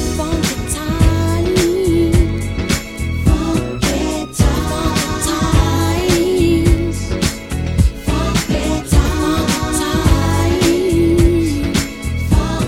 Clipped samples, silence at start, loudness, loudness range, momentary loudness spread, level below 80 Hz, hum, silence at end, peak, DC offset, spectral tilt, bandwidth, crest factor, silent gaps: under 0.1%; 0 s; -16 LUFS; 2 LU; 6 LU; -20 dBFS; none; 0 s; 0 dBFS; under 0.1%; -5.5 dB/octave; 16.5 kHz; 14 dB; none